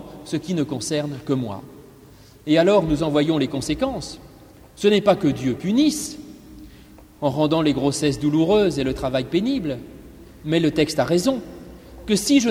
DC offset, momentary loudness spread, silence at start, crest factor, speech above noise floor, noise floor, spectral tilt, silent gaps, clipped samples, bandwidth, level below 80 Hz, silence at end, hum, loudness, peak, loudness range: under 0.1%; 18 LU; 0 s; 18 dB; 27 dB; -47 dBFS; -5.5 dB/octave; none; under 0.1%; 15.5 kHz; -46 dBFS; 0 s; none; -21 LUFS; -2 dBFS; 2 LU